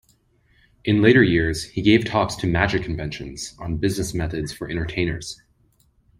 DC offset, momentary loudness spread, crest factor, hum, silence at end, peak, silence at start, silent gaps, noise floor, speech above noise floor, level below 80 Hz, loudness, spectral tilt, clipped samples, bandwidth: under 0.1%; 16 LU; 20 dB; none; 0.85 s; -2 dBFS; 0.85 s; none; -61 dBFS; 40 dB; -42 dBFS; -21 LUFS; -5.5 dB/octave; under 0.1%; 16 kHz